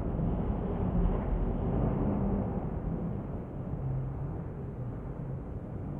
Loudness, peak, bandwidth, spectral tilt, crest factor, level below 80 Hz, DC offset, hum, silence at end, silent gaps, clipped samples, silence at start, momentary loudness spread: -34 LUFS; -16 dBFS; 3.4 kHz; -12 dB/octave; 16 dB; -38 dBFS; under 0.1%; none; 0 s; none; under 0.1%; 0 s; 9 LU